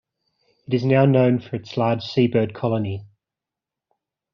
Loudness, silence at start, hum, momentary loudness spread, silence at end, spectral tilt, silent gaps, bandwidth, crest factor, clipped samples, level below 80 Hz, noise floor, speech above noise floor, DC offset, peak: -21 LUFS; 0.7 s; none; 11 LU; 1.3 s; -7 dB/octave; none; 6.4 kHz; 18 dB; under 0.1%; -62 dBFS; -87 dBFS; 68 dB; under 0.1%; -4 dBFS